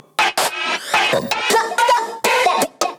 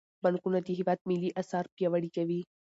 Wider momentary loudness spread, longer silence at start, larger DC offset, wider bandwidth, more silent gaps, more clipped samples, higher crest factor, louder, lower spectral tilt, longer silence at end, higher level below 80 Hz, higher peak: about the same, 3 LU vs 4 LU; about the same, 0.2 s vs 0.25 s; neither; first, over 20 kHz vs 8 kHz; second, none vs 1.01-1.05 s, 1.72-1.77 s; neither; about the same, 14 dB vs 16 dB; first, -17 LUFS vs -32 LUFS; second, -1 dB/octave vs -8 dB/octave; second, 0 s vs 0.35 s; first, -62 dBFS vs -78 dBFS; first, -4 dBFS vs -16 dBFS